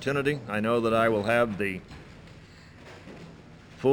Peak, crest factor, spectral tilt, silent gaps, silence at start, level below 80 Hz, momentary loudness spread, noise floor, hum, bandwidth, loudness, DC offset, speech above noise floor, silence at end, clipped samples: -10 dBFS; 20 dB; -6.5 dB/octave; none; 0 s; -56 dBFS; 24 LU; -49 dBFS; none; 17 kHz; -26 LUFS; under 0.1%; 23 dB; 0 s; under 0.1%